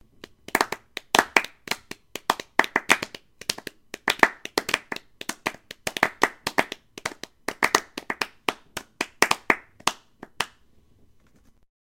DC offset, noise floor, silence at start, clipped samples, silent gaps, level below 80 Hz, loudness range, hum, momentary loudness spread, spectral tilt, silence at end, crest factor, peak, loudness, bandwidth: under 0.1%; -57 dBFS; 0.55 s; under 0.1%; none; -60 dBFS; 3 LU; none; 14 LU; -1.5 dB/octave; 1.5 s; 28 dB; 0 dBFS; -26 LUFS; 17 kHz